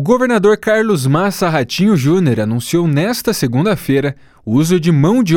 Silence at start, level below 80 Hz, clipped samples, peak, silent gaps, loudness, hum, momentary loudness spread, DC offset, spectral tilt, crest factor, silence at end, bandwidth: 0 s; -46 dBFS; under 0.1%; 0 dBFS; none; -14 LUFS; none; 4 LU; under 0.1%; -6 dB/octave; 14 dB; 0 s; 18 kHz